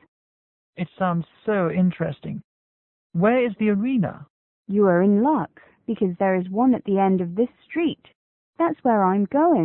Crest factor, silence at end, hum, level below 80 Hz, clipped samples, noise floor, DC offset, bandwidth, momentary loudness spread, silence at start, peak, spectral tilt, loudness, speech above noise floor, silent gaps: 16 dB; 0 s; none; -62 dBFS; under 0.1%; under -90 dBFS; under 0.1%; 3.9 kHz; 13 LU; 0.8 s; -6 dBFS; -12.5 dB/octave; -22 LUFS; over 69 dB; 2.44-3.10 s, 4.30-4.63 s, 8.15-8.53 s